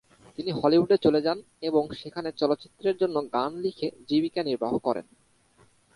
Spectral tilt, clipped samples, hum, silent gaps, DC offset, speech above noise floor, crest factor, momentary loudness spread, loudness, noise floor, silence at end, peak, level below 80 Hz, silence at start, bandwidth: -7 dB/octave; under 0.1%; none; none; under 0.1%; 36 dB; 20 dB; 12 LU; -27 LUFS; -62 dBFS; 0.95 s; -8 dBFS; -64 dBFS; 0.4 s; 11.5 kHz